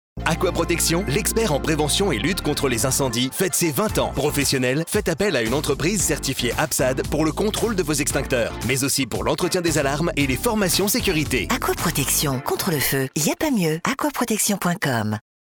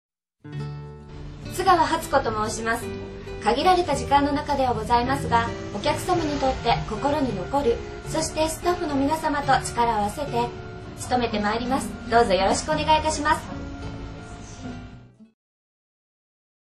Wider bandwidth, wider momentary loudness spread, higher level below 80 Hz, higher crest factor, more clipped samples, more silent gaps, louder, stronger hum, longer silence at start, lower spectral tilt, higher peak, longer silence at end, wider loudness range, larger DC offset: first, over 20 kHz vs 13.5 kHz; second, 3 LU vs 17 LU; first, -36 dBFS vs -42 dBFS; about the same, 16 dB vs 20 dB; neither; neither; about the same, -21 LUFS vs -23 LUFS; neither; second, 0.15 s vs 0.45 s; about the same, -3.5 dB/octave vs -4.5 dB/octave; about the same, -6 dBFS vs -4 dBFS; second, 0.25 s vs 1.45 s; about the same, 1 LU vs 3 LU; neither